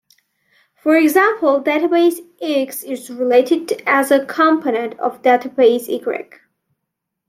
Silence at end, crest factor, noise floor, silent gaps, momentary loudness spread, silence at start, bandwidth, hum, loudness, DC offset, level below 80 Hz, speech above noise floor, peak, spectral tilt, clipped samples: 1.05 s; 16 dB; -78 dBFS; none; 10 LU; 0.85 s; 16.5 kHz; none; -16 LUFS; under 0.1%; -72 dBFS; 62 dB; -2 dBFS; -3.5 dB/octave; under 0.1%